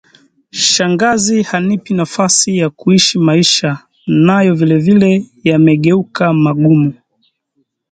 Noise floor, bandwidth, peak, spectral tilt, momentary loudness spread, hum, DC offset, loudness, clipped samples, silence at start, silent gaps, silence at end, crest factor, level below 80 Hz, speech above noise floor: -64 dBFS; 9.4 kHz; 0 dBFS; -4.5 dB/octave; 6 LU; none; under 0.1%; -11 LUFS; under 0.1%; 0.55 s; none; 1 s; 12 dB; -52 dBFS; 53 dB